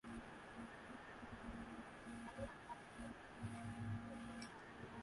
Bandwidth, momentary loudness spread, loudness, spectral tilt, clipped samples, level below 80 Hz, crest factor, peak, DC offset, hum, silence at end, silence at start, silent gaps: 11.5 kHz; 6 LU; -53 LUFS; -6 dB/octave; under 0.1%; -66 dBFS; 16 dB; -36 dBFS; under 0.1%; none; 0 s; 0.05 s; none